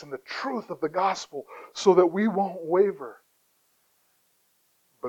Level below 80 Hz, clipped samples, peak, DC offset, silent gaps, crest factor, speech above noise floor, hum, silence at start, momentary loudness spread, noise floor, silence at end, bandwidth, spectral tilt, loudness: -76 dBFS; under 0.1%; -6 dBFS; under 0.1%; none; 22 dB; 43 dB; none; 0 s; 19 LU; -68 dBFS; 0 s; 8.4 kHz; -5.5 dB/octave; -25 LUFS